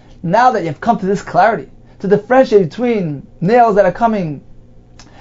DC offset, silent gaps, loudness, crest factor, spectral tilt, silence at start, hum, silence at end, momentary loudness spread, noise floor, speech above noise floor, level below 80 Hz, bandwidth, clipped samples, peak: under 0.1%; none; -14 LUFS; 14 dB; -7 dB/octave; 0.1 s; none; 0.2 s; 13 LU; -40 dBFS; 27 dB; -42 dBFS; 7.8 kHz; under 0.1%; 0 dBFS